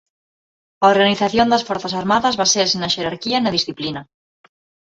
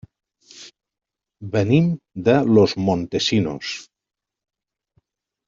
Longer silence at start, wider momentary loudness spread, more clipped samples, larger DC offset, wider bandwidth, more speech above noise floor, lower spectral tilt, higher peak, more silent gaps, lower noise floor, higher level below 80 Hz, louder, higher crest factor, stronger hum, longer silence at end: first, 0.8 s vs 0.55 s; second, 9 LU vs 14 LU; neither; neither; about the same, 8 kHz vs 7.6 kHz; first, over 73 dB vs 48 dB; second, -3 dB/octave vs -6.5 dB/octave; about the same, -2 dBFS vs -2 dBFS; neither; first, under -90 dBFS vs -67 dBFS; about the same, -54 dBFS vs -56 dBFS; about the same, -17 LUFS vs -19 LUFS; about the same, 18 dB vs 20 dB; neither; second, 0.85 s vs 1.65 s